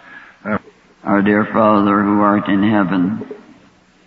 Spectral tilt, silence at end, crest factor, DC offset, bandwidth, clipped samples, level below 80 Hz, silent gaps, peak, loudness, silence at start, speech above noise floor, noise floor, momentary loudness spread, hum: -9.5 dB/octave; 0.7 s; 16 dB; under 0.1%; 4.7 kHz; under 0.1%; -54 dBFS; none; 0 dBFS; -15 LUFS; 0.1 s; 35 dB; -49 dBFS; 14 LU; none